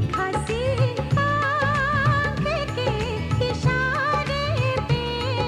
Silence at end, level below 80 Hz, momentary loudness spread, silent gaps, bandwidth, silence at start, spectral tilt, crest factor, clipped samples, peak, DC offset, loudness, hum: 0 s; -36 dBFS; 4 LU; none; 12 kHz; 0 s; -6 dB/octave; 12 dB; under 0.1%; -10 dBFS; under 0.1%; -23 LUFS; none